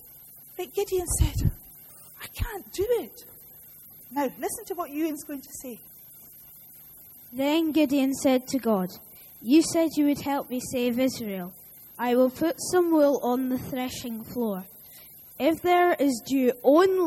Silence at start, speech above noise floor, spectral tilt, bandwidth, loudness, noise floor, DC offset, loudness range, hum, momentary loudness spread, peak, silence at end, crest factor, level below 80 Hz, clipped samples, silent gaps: 0.05 s; 24 dB; -5 dB/octave; 16 kHz; -26 LUFS; -49 dBFS; under 0.1%; 9 LU; none; 24 LU; -8 dBFS; 0 s; 18 dB; -42 dBFS; under 0.1%; none